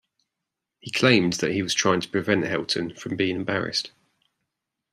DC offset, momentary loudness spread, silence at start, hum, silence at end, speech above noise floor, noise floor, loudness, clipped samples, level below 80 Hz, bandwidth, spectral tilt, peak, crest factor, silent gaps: under 0.1%; 10 LU; 0.85 s; none; 1.05 s; 61 dB; -84 dBFS; -23 LUFS; under 0.1%; -64 dBFS; 14 kHz; -4 dB/octave; -2 dBFS; 24 dB; none